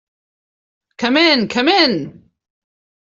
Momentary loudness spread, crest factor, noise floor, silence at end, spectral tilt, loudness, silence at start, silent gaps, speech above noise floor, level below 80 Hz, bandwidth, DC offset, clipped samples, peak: 11 LU; 16 dB; under -90 dBFS; 0.9 s; -4 dB/octave; -14 LUFS; 1 s; none; over 75 dB; -60 dBFS; 7.6 kHz; under 0.1%; under 0.1%; -2 dBFS